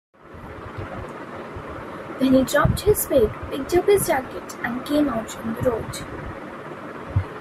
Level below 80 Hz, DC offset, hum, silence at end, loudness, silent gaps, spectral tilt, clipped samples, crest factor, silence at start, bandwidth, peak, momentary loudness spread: -40 dBFS; under 0.1%; none; 0 s; -22 LUFS; none; -5.5 dB/octave; under 0.1%; 18 dB; 0.25 s; 16 kHz; -6 dBFS; 16 LU